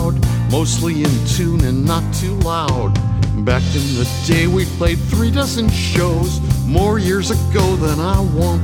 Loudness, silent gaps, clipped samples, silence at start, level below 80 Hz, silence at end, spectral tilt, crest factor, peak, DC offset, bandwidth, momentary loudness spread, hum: -16 LUFS; none; under 0.1%; 0 s; -24 dBFS; 0 s; -5.5 dB/octave; 14 dB; 0 dBFS; under 0.1%; 19 kHz; 2 LU; none